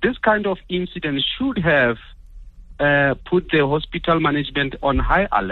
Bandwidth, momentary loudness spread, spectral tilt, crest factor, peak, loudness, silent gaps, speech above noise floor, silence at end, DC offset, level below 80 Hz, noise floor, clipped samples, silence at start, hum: 4.4 kHz; 7 LU; -8.5 dB/octave; 16 dB; -4 dBFS; -19 LUFS; none; 20 dB; 0 s; under 0.1%; -34 dBFS; -40 dBFS; under 0.1%; 0 s; none